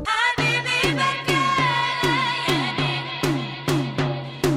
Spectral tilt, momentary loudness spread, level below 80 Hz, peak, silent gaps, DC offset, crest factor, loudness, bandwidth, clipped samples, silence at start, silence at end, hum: -4.5 dB/octave; 6 LU; -46 dBFS; -6 dBFS; none; under 0.1%; 16 dB; -21 LUFS; 16 kHz; under 0.1%; 0 s; 0 s; none